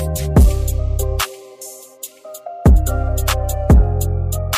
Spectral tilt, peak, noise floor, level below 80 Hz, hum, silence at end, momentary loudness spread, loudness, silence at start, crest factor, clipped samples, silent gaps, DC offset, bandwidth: -5.5 dB/octave; -4 dBFS; -37 dBFS; -18 dBFS; none; 0 s; 19 LU; -17 LUFS; 0 s; 12 dB; under 0.1%; none; under 0.1%; 16 kHz